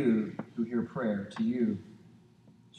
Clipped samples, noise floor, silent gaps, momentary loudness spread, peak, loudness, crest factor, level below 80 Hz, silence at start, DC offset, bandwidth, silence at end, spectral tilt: under 0.1%; -59 dBFS; none; 9 LU; -16 dBFS; -33 LUFS; 16 dB; -74 dBFS; 0 s; under 0.1%; 8.4 kHz; 0 s; -8.5 dB/octave